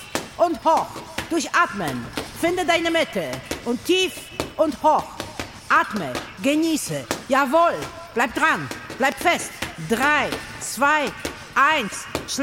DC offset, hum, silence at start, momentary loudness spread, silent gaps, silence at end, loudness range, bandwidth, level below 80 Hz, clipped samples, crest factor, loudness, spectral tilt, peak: under 0.1%; none; 0 s; 11 LU; none; 0 s; 2 LU; 17 kHz; -50 dBFS; under 0.1%; 18 dB; -22 LUFS; -3 dB/octave; -6 dBFS